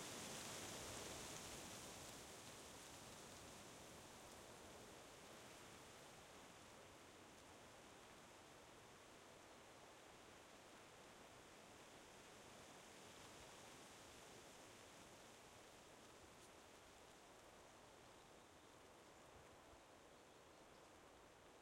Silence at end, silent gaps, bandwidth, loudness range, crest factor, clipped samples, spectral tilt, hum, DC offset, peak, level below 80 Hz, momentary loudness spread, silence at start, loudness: 0 s; none; 16 kHz; 9 LU; 22 dB; under 0.1%; -2.5 dB/octave; none; under 0.1%; -40 dBFS; -80 dBFS; 12 LU; 0 s; -60 LUFS